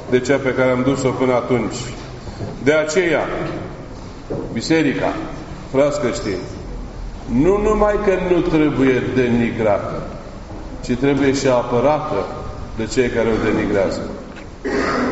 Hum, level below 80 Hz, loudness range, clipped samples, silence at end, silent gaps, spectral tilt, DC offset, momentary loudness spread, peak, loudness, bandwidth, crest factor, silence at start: none; -34 dBFS; 4 LU; under 0.1%; 0 s; none; -5.5 dB/octave; under 0.1%; 16 LU; -2 dBFS; -18 LUFS; 8 kHz; 16 dB; 0 s